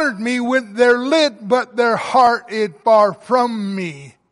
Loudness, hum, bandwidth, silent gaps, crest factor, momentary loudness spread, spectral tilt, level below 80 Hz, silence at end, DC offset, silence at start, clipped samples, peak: -16 LUFS; none; 11.5 kHz; none; 14 dB; 9 LU; -4.5 dB/octave; -64 dBFS; 0.25 s; under 0.1%; 0 s; under 0.1%; -2 dBFS